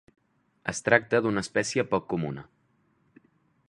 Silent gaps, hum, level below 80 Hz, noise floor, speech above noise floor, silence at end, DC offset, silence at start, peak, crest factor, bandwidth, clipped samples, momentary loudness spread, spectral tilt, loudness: none; none; -62 dBFS; -69 dBFS; 42 dB; 1.25 s; under 0.1%; 0.65 s; -2 dBFS; 26 dB; 11.5 kHz; under 0.1%; 13 LU; -4.5 dB/octave; -27 LUFS